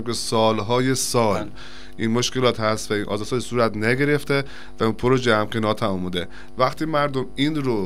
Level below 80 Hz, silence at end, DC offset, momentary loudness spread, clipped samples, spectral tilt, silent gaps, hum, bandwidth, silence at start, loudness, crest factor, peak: -48 dBFS; 0 s; 3%; 8 LU; under 0.1%; -4.5 dB/octave; none; none; 16 kHz; 0 s; -22 LUFS; 18 dB; -2 dBFS